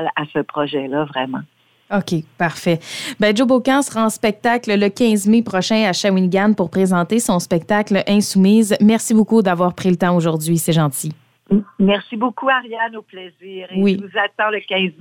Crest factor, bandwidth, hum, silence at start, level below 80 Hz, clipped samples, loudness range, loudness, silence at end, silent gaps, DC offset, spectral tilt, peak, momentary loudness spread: 14 dB; 17 kHz; none; 0 s; -56 dBFS; under 0.1%; 5 LU; -17 LUFS; 0.1 s; none; under 0.1%; -5 dB/octave; -4 dBFS; 10 LU